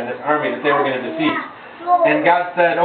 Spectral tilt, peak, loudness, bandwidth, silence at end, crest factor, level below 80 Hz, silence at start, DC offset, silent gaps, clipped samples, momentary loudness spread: -8.5 dB/octave; 0 dBFS; -17 LUFS; 4.5 kHz; 0 s; 16 dB; -66 dBFS; 0 s; under 0.1%; none; under 0.1%; 9 LU